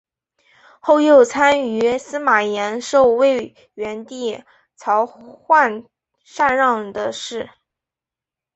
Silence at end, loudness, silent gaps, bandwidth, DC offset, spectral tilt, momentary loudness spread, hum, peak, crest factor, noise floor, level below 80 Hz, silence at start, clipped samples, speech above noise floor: 1.1 s; -17 LUFS; none; 8.2 kHz; under 0.1%; -3.5 dB/octave; 17 LU; none; -2 dBFS; 18 dB; -88 dBFS; -60 dBFS; 0.85 s; under 0.1%; 71 dB